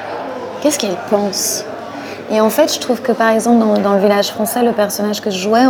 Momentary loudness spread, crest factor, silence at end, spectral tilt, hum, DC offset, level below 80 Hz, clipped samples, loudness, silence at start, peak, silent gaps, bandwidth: 12 LU; 14 dB; 0 s; -4 dB/octave; none; under 0.1%; -62 dBFS; under 0.1%; -15 LUFS; 0 s; 0 dBFS; none; 20 kHz